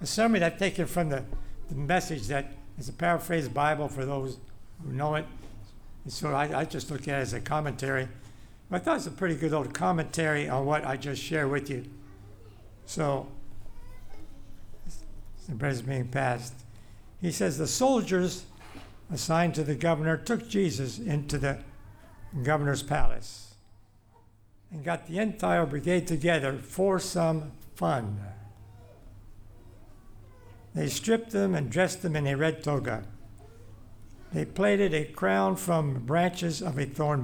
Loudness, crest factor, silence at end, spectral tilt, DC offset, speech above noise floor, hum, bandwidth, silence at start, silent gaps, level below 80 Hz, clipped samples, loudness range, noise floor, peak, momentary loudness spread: -29 LUFS; 20 dB; 0 s; -5.5 dB/octave; under 0.1%; 30 dB; none; 20 kHz; 0 s; none; -44 dBFS; under 0.1%; 7 LU; -58 dBFS; -10 dBFS; 17 LU